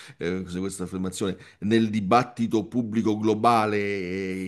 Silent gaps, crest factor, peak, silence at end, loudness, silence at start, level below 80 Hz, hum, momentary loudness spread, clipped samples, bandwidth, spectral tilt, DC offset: none; 20 dB; -6 dBFS; 0 s; -25 LUFS; 0 s; -64 dBFS; none; 10 LU; under 0.1%; 12.5 kHz; -6 dB/octave; under 0.1%